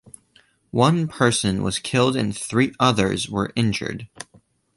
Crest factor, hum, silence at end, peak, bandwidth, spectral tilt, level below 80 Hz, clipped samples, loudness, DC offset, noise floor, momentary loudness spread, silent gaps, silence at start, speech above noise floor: 20 dB; none; 0.55 s; -2 dBFS; 11.5 kHz; -5 dB/octave; -48 dBFS; under 0.1%; -21 LUFS; under 0.1%; -59 dBFS; 13 LU; none; 0.75 s; 38 dB